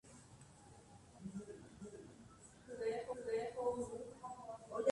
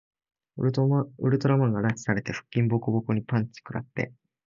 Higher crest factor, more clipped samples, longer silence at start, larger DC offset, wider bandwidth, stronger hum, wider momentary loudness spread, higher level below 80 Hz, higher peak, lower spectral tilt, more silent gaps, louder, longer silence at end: about the same, 22 dB vs 18 dB; neither; second, 0.05 s vs 0.55 s; neither; first, 11.5 kHz vs 7.6 kHz; neither; first, 20 LU vs 11 LU; second, -72 dBFS vs -60 dBFS; second, -22 dBFS vs -8 dBFS; second, -5.5 dB/octave vs -8 dB/octave; neither; second, -46 LUFS vs -27 LUFS; second, 0 s vs 0.4 s